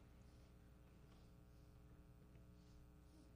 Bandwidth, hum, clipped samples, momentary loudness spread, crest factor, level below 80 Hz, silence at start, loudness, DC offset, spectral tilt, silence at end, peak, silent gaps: 15 kHz; 60 Hz at -70 dBFS; under 0.1%; 1 LU; 14 dB; -68 dBFS; 0 s; -67 LUFS; under 0.1%; -6.5 dB/octave; 0 s; -52 dBFS; none